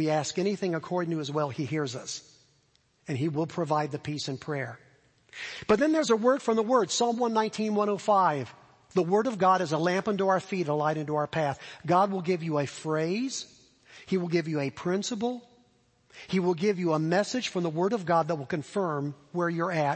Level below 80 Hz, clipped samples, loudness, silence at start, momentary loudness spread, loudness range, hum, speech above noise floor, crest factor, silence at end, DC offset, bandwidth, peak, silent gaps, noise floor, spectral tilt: -68 dBFS; under 0.1%; -28 LUFS; 0 s; 10 LU; 6 LU; none; 40 dB; 20 dB; 0 s; under 0.1%; 8.8 kHz; -8 dBFS; none; -68 dBFS; -5.5 dB/octave